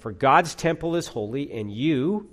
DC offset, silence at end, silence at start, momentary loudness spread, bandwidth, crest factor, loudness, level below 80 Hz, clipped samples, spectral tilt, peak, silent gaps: under 0.1%; 0.05 s; 0.05 s; 11 LU; 15 kHz; 20 dB; -24 LUFS; -54 dBFS; under 0.1%; -5.5 dB/octave; -4 dBFS; none